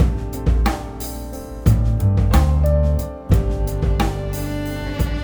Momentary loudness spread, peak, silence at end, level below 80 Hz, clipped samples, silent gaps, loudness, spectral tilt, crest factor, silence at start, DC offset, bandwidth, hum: 11 LU; -2 dBFS; 0 s; -20 dBFS; under 0.1%; none; -20 LUFS; -7 dB/octave; 16 dB; 0 s; under 0.1%; over 20 kHz; none